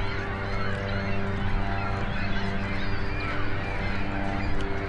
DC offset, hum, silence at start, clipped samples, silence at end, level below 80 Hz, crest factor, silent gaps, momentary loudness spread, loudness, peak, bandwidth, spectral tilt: under 0.1%; none; 0 s; under 0.1%; 0 s; -32 dBFS; 12 dB; none; 1 LU; -30 LUFS; -14 dBFS; 7.6 kHz; -7 dB/octave